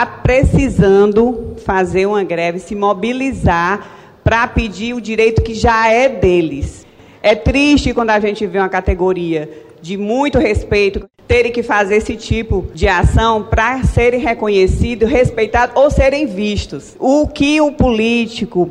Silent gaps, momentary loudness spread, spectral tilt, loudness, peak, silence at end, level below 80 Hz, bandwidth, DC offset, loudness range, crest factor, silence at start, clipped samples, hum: none; 8 LU; -6 dB/octave; -14 LUFS; -2 dBFS; 0 s; -24 dBFS; 11 kHz; under 0.1%; 3 LU; 12 dB; 0 s; under 0.1%; none